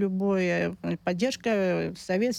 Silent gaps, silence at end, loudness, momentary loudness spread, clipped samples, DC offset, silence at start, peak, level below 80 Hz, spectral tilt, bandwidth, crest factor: none; 0 s; -27 LUFS; 5 LU; under 0.1%; under 0.1%; 0 s; -14 dBFS; -60 dBFS; -6 dB/octave; 14.5 kHz; 12 dB